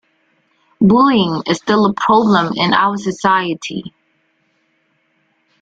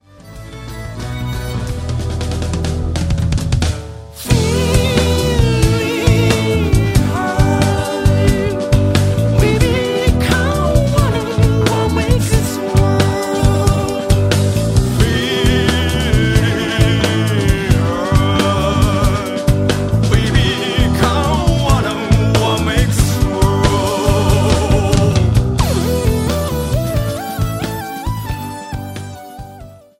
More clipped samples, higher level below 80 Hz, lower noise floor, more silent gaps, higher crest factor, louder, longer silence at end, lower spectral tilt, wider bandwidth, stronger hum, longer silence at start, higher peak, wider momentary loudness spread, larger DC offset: neither; second, -54 dBFS vs -22 dBFS; first, -62 dBFS vs -36 dBFS; neither; about the same, 16 dB vs 14 dB; about the same, -14 LUFS vs -15 LUFS; first, 1.75 s vs 0.25 s; about the same, -5.5 dB/octave vs -5.5 dB/octave; second, 7.8 kHz vs 16 kHz; neither; first, 0.8 s vs 0.25 s; about the same, 0 dBFS vs 0 dBFS; about the same, 10 LU vs 9 LU; neither